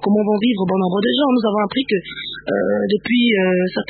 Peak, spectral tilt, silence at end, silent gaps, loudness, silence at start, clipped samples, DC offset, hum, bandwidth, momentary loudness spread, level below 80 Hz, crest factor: -4 dBFS; -11.5 dB/octave; 0.05 s; none; -18 LUFS; 0 s; under 0.1%; under 0.1%; none; 4.8 kHz; 6 LU; -54 dBFS; 12 dB